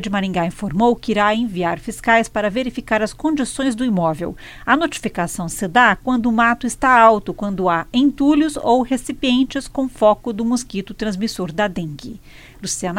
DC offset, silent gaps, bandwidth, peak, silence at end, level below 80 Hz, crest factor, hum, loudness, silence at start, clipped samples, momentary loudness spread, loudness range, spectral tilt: under 0.1%; none; 16.5 kHz; 0 dBFS; 0 s; -42 dBFS; 18 dB; none; -18 LUFS; 0 s; under 0.1%; 10 LU; 5 LU; -4.5 dB/octave